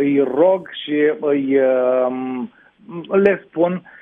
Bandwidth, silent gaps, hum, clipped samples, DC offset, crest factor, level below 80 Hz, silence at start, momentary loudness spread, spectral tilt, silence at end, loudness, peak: 3.9 kHz; none; none; under 0.1%; under 0.1%; 16 dB; -64 dBFS; 0 s; 12 LU; -9 dB/octave; 0.2 s; -18 LUFS; -2 dBFS